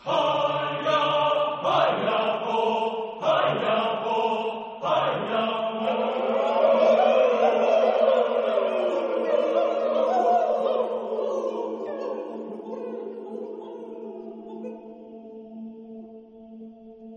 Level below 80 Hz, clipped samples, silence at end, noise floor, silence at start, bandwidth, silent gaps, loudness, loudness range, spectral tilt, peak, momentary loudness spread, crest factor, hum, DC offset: -74 dBFS; under 0.1%; 0 s; -45 dBFS; 0.05 s; 7.6 kHz; none; -24 LUFS; 16 LU; -5.5 dB/octave; -8 dBFS; 20 LU; 16 dB; none; under 0.1%